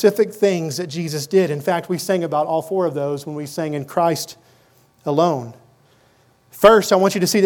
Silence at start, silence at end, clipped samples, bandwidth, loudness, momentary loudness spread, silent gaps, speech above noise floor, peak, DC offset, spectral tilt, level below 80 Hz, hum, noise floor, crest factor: 0 s; 0 s; under 0.1%; 19 kHz; -19 LUFS; 12 LU; none; 38 dB; 0 dBFS; under 0.1%; -5 dB/octave; -56 dBFS; none; -56 dBFS; 18 dB